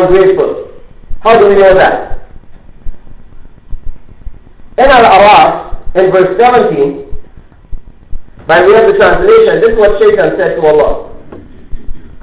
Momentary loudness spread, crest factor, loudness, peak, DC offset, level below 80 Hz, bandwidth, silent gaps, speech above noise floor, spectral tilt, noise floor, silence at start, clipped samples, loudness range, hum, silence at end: 14 LU; 8 dB; -7 LUFS; 0 dBFS; under 0.1%; -28 dBFS; 4 kHz; none; 27 dB; -9 dB/octave; -32 dBFS; 0 s; 0.2%; 4 LU; none; 0.05 s